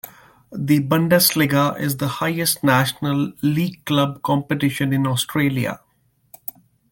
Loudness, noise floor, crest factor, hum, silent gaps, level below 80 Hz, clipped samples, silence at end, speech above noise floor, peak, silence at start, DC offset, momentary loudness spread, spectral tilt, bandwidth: -19 LUFS; -63 dBFS; 18 dB; none; none; -56 dBFS; under 0.1%; 1.15 s; 44 dB; -2 dBFS; 0.05 s; under 0.1%; 18 LU; -5 dB/octave; 17 kHz